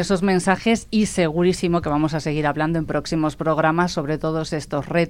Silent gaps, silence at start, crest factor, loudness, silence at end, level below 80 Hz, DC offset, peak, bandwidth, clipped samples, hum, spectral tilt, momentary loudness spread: none; 0 s; 16 dB; -21 LUFS; 0 s; -42 dBFS; under 0.1%; -4 dBFS; 15 kHz; under 0.1%; none; -6 dB/octave; 5 LU